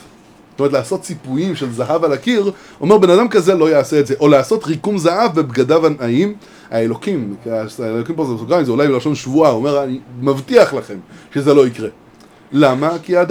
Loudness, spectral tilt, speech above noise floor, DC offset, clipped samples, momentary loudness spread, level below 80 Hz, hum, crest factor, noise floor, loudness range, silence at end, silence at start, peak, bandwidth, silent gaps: -15 LUFS; -6.5 dB/octave; 30 dB; under 0.1%; under 0.1%; 11 LU; -58 dBFS; none; 14 dB; -44 dBFS; 4 LU; 0 s; 0.6 s; 0 dBFS; 16 kHz; none